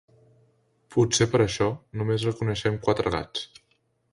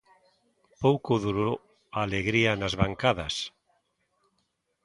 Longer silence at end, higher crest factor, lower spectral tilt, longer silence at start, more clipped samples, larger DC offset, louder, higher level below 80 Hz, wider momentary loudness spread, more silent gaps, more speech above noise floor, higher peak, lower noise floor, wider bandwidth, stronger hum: second, 0.65 s vs 1.35 s; about the same, 20 dB vs 22 dB; about the same, -5 dB/octave vs -5.5 dB/octave; about the same, 0.9 s vs 0.8 s; neither; neither; about the same, -25 LUFS vs -27 LUFS; about the same, -50 dBFS vs -50 dBFS; about the same, 10 LU vs 10 LU; neither; second, 45 dB vs 49 dB; about the same, -8 dBFS vs -8 dBFS; second, -70 dBFS vs -76 dBFS; about the same, 11.5 kHz vs 11.5 kHz; neither